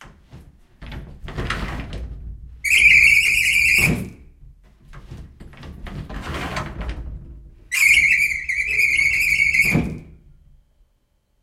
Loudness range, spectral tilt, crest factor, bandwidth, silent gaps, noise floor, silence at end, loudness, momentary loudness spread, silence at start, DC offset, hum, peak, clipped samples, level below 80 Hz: 16 LU; -2.5 dB/octave; 20 dB; 16 kHz; none; -65 dBFS; 1.4 s; -15 LUFS; 25 LU; 0 s; under 0.1%; none; -2 dBFS; under 0.1%; -36 dBFS